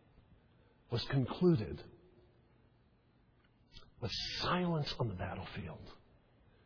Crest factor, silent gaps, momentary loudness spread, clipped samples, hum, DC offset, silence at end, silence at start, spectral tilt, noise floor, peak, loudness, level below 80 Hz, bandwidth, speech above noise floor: 20 dB; none; 18 LU; under 0.1%; none; under 0.1%; 0.7 s; 0.9 s; -5 dB/octave; -69 dBFS; -20 dBFS; -37 LUFS; -60 dBFS; 5.4 kHz; 33 dB